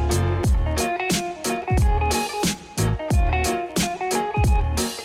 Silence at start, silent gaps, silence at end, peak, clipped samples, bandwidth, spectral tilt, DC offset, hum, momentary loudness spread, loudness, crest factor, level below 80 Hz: 0 s; none; 0 s; -10 dBFS; under 0.1%; 16.5 kHz; -4.5 dB/octave; under 0.1%; none; 4 LU; -23 LUFS; 12 dB; -26 dBFS